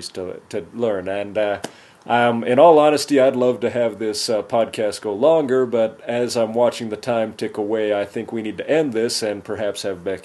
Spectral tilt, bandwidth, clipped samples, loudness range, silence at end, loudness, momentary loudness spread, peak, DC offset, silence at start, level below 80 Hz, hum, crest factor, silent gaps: -4.5 dB/octave; 12.5 kHz; under 0.1%; 5 LU; 0.05 s; -19 LUFS; 11 LU; -2 dBFS; under 0.1%; 0 s; -66 dBFS; none; 18 dB; none